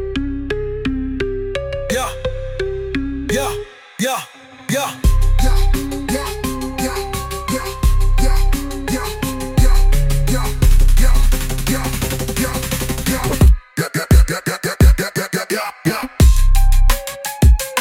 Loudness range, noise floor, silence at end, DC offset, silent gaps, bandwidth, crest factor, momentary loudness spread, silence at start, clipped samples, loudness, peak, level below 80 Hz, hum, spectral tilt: 6 LU; -36 dBFS; 0 s; under 0.1%; none; 16.5 kHz; 14 dB; 9 LU; 0 s; under 0.1%; -18 LUFS; -2 dBFS; -16 dBFS; none; -5 dB/octave